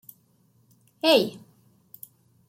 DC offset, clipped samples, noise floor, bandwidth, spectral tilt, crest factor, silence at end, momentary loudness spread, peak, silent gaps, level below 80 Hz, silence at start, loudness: under 0.1%; under 0.1%; -63 dBFS; 16.5 kHz; -4 dB/octave; 22 dB; 1.1 s; 25 LU; -8 dBFS; none; -76 dBFS; 1.05 s; -22 LUFS